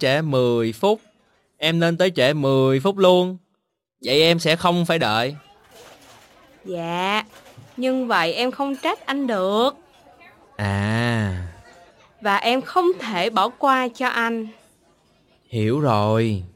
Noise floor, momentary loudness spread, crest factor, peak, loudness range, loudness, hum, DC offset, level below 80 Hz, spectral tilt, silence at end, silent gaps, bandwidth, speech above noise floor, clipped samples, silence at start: -73 dBFS; 11 LU; 18 dB; -4 dBFS; 6 LU; -20 LUFS; none; under 0.1%; -58 dBFS; -5.5 dB/octave; 0.05 s; none; 16.5 kHz; 53 dB; under 0.1%; 0 s